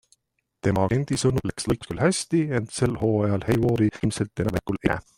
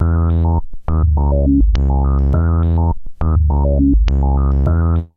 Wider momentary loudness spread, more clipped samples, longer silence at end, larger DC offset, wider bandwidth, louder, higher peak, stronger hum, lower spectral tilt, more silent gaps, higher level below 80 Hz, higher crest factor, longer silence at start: about the same, 5 LU vs 4 LU; neither; about the same, 0.15 s vs 0.1 s; neither; first, 16 kHz vs 5 kHz; second, -24 LUFS vs -16 LUFS; about the same, -6 dBFS vs -4 dBFS; neither; second, -6 dB/octave vs -10.5 dB/octave; neither; second, -46 dBFS vs -16 dBFS; first, 18 dB vs 10 dB; first, 0.65 s vs 0 s